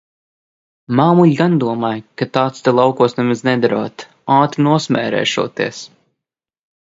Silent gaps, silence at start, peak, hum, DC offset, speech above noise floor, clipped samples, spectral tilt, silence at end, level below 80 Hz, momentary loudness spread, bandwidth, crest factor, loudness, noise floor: none; 0.9 s; 0 dBFS; none; under 0.1%; 69 dB; under 0.1%; -6.5 dB/octave; 0.95 s; -60 dBFS; 10 LU; 7.8 kHz; 16 dB; -15 LUFS; -84 dBFS